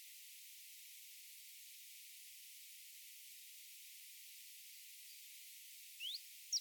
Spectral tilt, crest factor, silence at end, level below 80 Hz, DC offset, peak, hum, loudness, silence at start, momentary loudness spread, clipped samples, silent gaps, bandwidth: 8.5 dB/octave; 24 dB; 0 s; under -90 dBFS; under 0.1%; -30 dBFS; none; -52 LUFS; 0 s; 8 LU; under 0.1%; none; 19 kHz